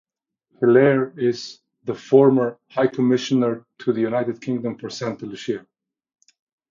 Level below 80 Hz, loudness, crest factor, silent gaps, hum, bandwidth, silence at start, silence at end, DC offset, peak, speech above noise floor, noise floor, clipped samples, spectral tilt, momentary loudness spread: -68 dBFS; -21 LUFS; 20 dB; none; none; 7.4 kHz; 0.6 s; 1.1 s; under 0.1%; -2 dBFS; 50 dB; -70 dBFS; under 0.1%; -6.5 dB/octave; 16 LU